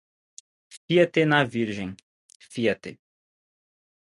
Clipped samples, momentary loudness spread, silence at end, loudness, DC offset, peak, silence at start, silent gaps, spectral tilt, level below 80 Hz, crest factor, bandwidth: under 0.1%; 17 LU; 1.1 s; -24 LUFS; under 0.1%; -4 dBFS; 0.7 s; 0.77-0.88 s, 2.03-2.29 s, 2.35-2.40 s; -6 dB/octave; -64 dBFS; 22 dB; 11.5 kHz